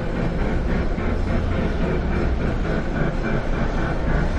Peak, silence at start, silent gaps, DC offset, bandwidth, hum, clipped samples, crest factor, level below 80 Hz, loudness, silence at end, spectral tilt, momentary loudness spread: -6 dBFS; 0 s; none; under 0.1%; 8 kHz; none; under 0.1%; 14 dB; -24 dBFS; -24 LUFS; 0 s; -8 dB/octave; 2 LU